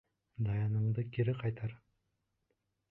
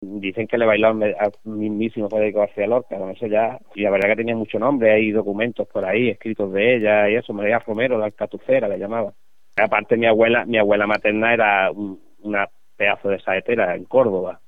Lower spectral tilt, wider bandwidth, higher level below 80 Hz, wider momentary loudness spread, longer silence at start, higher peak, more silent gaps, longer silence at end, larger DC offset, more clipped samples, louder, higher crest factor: first, -11 dB/octave vs -8 dB/octave; second, 4 kHz vs 5.2 kHz; about the same, -62 dBFS vs -60 dBFS; about the same, 10 LU vs 10 LU; first, 0.4 s vs 0 s; second, -20 dBFS vs -2 dBFS; neither; first, 1.15 s vs 0.15 s; second, under 0.1% vs 0.6%; neither; second, -36 LUFS vs -20 LUFS; about the same, 16 dB vs 16 dB